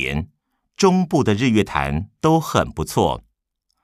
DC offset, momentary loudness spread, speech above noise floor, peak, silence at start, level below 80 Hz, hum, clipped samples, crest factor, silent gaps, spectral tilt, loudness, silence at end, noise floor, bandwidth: under 0.1%; 8 LU; 55 dB; -2 dBFS; 0 s; -40 dBFS; none; under 0.1%; 18 dB; none; -6 dB/octave; -19 LUFS; 0.65 s; -74 dBFS; 15.5 kHz